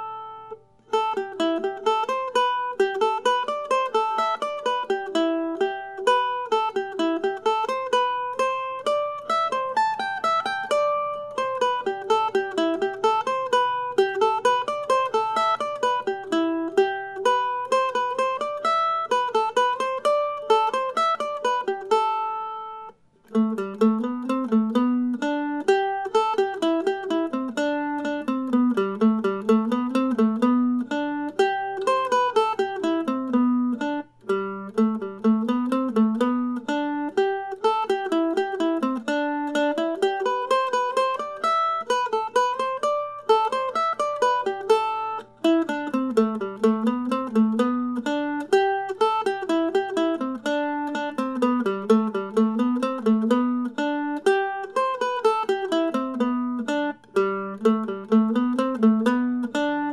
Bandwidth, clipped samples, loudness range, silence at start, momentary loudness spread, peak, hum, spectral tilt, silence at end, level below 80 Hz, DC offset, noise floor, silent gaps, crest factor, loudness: 12 kHz; under 0.1%; 2 LU; 0 s; 5 LU; -6 dBFS; none; -5 dB/octave; 0 s; -72 dBFS; under 0.1%; -46 dBFS; none; 16 dB; -24 LUFS